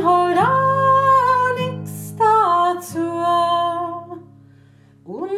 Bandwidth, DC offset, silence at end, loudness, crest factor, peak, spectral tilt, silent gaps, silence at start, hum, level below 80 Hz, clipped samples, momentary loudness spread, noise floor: 14.5 kHz; under 0.1%; 0 s; -17 LUFS; 12 dB; -6 dBFS; -5.5 dB/octave; none; 0 s; none; -68 dBFS; under 0.1%; 17 LU; -49 dBFS